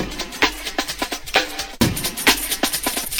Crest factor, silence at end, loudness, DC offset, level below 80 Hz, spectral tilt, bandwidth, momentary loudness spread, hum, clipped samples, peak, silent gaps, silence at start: 22 dB; 0 s; -20 LUFS; under 0.1%; -38 dBFS; -2 dB/octave; over 20 kHz; 8 LU; none; under 0.1%; 0 dBFS; none; 0 s